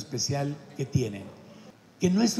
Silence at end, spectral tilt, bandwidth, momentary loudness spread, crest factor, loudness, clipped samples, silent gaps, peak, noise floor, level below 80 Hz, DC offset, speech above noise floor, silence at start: 0 s; -5 dB/octave; 14 kHz; 20 LU; 18 dB; -29 LUFS; under 0.1%; none; -12 dBFS; -51 dBFS; -62 dBFS; under 0.1%; 24 dB; 0 s